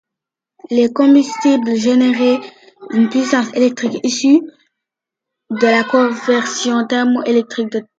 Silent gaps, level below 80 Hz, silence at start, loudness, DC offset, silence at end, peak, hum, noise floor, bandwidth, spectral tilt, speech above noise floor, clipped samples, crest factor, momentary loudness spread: none; -66 dBFS; 0.7 s; -14 LUFS; under 0.1%; 0.15 s; 0 dBFS; none; -84 dBFS; 8.6 kHz; -4 dB/octave; 70 dB; under 0.1%; 14 dB; 7 LU